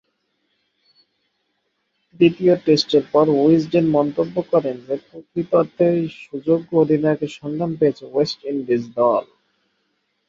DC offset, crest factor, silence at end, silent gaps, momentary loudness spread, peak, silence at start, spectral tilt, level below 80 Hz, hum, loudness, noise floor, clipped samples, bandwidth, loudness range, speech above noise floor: under 0.1%; 18 dB; 1.05 s; none; 11 LU; -2 dBFS; 2.2 s; -7 dB/octave; -62 dBFS; none; -19 LUFS; -71 dBFS; under 0.1%; 7.4 kHz; 3 LU; 53 dB